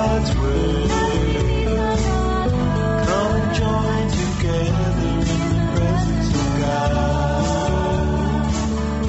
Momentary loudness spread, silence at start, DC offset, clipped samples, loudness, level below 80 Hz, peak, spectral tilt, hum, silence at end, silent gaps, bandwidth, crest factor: 1 LU; 0 s; under 0.1%; under 0.1%; -20 LUFS; -26 dBFS; -6 dBFS; -6.5 dB/octave; none; 0 s; none; 8.2 kHz; 12 dB